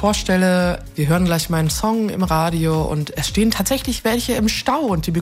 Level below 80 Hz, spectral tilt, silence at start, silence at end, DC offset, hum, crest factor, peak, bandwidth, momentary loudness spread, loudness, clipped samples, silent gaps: -32 dBFS; -5 dB/octave; 0 s; 0 s; under 0.1%; none; 14 dB; -4 dBFS; 16 kHz; 4 LU; -19 LUFS; under 0.1%; none